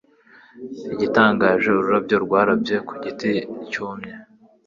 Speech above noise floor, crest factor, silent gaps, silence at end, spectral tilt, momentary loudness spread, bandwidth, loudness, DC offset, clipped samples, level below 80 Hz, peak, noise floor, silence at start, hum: 31 dB; 20 dB; none; 0.45 s; -6.5 dB/octave; 18 LU; 7.4 kHz; -20 LUFS; under 0.1%; under 0.1%; -58 dBFS; -2 dBFS; -51 dBFS; 0.55 s; none